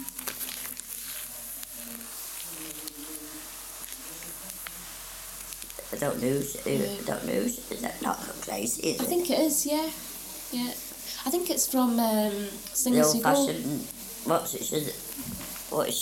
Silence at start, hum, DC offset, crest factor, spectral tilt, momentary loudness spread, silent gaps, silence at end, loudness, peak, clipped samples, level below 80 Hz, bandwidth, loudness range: 0 s; none; under 0.1%; 20 dB; -3 dB/octave; 13 LU; none; 0 s; -30 LUFS; -10 dBFS; under 0.1%; -58 dBFS; 18 kHz; 11 LU